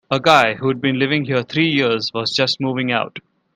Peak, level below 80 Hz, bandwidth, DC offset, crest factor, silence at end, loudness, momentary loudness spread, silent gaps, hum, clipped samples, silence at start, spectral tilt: 0 dBFS; -60 dBFS; 15 kHz; under 0.1%; 18 dB; 0.35 s; -17 LUFS; 7 LU; none; none; under 0.1%; 0.1 s; -5 dB/octave